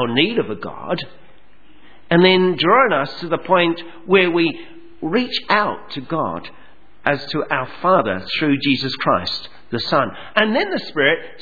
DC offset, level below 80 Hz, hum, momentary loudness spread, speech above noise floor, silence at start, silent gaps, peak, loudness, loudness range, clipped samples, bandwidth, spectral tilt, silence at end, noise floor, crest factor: 1%; -56 dBFS; none; 12 LU; 34 dB; 0 s; none; 0 dBFS; -18 LUFS; 4 LU; under 0.1%; 5 kHz; -7 dB/octave; 0.1 s; -52 dBFS; 20 dB